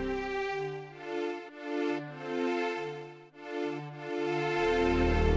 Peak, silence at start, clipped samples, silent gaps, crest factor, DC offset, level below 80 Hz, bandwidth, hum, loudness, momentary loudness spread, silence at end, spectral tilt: -14 dBFS; 0 s; under 0.1%; none; 18 dB; under 0.1%; -40 dBFS; 8 kHz; none; -33 LUFS; 13 LU; 0 s; -6.5 dB/octave